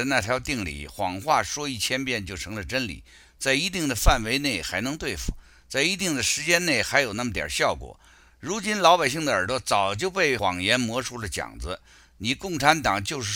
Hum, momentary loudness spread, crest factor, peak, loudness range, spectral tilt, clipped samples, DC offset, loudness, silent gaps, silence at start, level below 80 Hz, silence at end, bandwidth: none; 12 LU; 24 dB; -2 dBFS; 3 LU; -3 dB/octave; under 0.1%; under 0.1%; -24 LUFS; none; 0 s; -38 dBFS; 0 s; 17 kHz